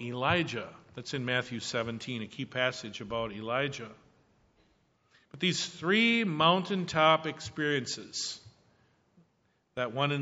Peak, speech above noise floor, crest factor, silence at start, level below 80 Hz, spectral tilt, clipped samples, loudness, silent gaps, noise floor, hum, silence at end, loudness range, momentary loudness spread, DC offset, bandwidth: -8 dBFS; 42 dB; 24 dB; 0 s; -66 dBFS; -3 dB/octave; under 0.1%; -30 LUFS; none; -73 dBFS; none; 0 s; 8 LU; 14 LU; under 0.1%; 8 kHz